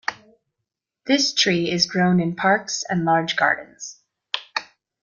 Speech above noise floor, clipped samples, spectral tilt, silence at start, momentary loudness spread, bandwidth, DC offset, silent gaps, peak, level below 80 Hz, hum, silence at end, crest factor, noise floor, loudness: 62 dB; under 0.1%; -4 dB/octave; 0.1 s; 14 LU; 7.4 kHz; under 0.1%; none; -4 dBFS; -62 dBFS; none; 0.4 s; 20 dB; -82 dBFS; -20 LUFS